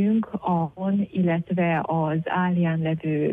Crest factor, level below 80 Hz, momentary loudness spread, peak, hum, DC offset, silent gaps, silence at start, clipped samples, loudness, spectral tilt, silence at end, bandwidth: 10 dB; -60 dBFS; 3 LU; -12 dBFS; none; under 0.1%; none; 0 s; under 0.1%; -24 LUFS; -10.5 dB/octave; 0 s; 3.7 kHz